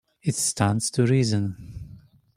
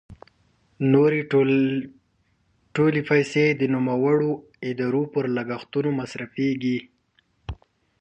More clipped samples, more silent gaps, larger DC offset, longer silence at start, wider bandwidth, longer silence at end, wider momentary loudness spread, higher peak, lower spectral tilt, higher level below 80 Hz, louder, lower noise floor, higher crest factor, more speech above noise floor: neither; neither; neither; first, 0.25 s vs 0.1 s; first, 16 kHz vs 8.4 kHz; about the same, 0.4 s vs 0.45 s; first, 19 LU vs 13 LU; about the same, -4 dBFS vs -6 dBFS; second, -5 dB/octave vs -7.5 dB/octave; about the same, -52 dBFS vs -54 dBFS; about the same, -23 LUFS vs -23 LUFS; second, -49 dBFS vs -67 dBFS; about the same, 20 dB vs 18 dB; second, 26 dB vs 45 dB